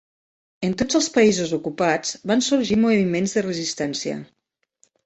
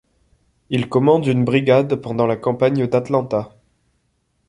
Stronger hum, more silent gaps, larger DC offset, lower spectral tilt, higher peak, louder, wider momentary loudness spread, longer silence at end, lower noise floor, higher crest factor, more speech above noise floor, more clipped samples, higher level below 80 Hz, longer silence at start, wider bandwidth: neither; neither; neither; second, -4 dB/octave vs -8 dB/octave; about the same, -4 dBFS vs -2 dBFS; second, -21 LUFS vs -18 LUFS; about the same, 9 LU vs 9 LU; second, 0.8 s vs 1 s; about the same, -64 dBFS vs -67 dBFS; about the same, 18 dB vs 18 dB; second, 43 dB vs 50 dB; neither; about the same, -56 dBFS vs -56 dBFS; about the same, 0.6 s vs 0.7 s; second, 8.2 kHz vs 11 kHz